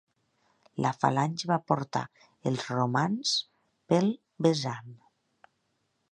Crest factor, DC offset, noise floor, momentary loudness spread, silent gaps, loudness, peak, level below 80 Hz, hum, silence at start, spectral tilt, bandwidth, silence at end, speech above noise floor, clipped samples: 22 dB; under 0.1%; -76 dBFS; 9 LU; none; -29 LUFS; -8 dBFS; -72 dBFS; none; 0.75 s; -5.5 dB/octave; 11 kHz; 1.15 s; 48 dB; under 0.1%